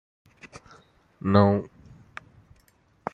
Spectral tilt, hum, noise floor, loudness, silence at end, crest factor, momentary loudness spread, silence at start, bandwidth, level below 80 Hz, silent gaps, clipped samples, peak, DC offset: -8.5 dB/octave; none; -62 dBFS; -23 LUFS; 1.5 s; 26 dB; 27 LU; 0.45 s; 7.4 kHz; -62 dBFS; none; under 0.1%; -4 dBFS; under 0.1%